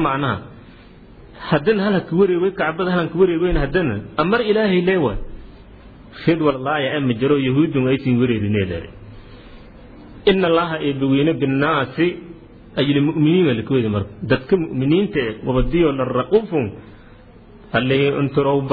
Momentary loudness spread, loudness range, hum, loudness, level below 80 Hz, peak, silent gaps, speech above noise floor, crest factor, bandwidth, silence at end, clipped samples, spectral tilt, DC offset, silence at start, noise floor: 7 LU; 2 LU; none; -18 LUFS; -36 dBFS; -2 dBFS; none; 26 dB; 16 dB; 4.9 kHz; 0 s; under 0.1%; -10.5 dB/octave; under 0.1%; 0 s; -43 dBFS